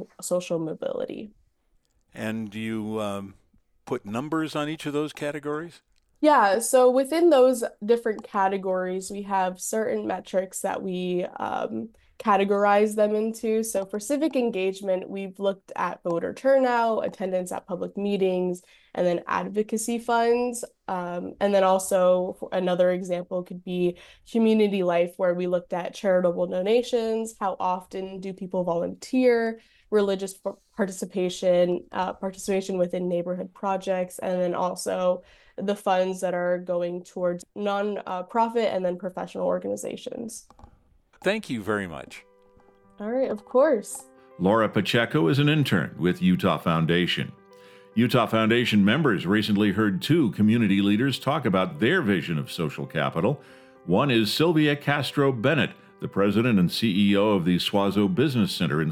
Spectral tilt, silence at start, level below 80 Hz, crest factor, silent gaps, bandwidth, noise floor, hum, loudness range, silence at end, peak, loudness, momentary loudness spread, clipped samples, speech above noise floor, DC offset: -5.5 dB/octave; 0 s; -62 dBFS; 18 dB; none; 16 kHz; -67 dBFS; none; 7 LU; 0 s; -6 dBFS; -25 LUFS; 11 LU; under 0.1%; 43 dB; under 0.1%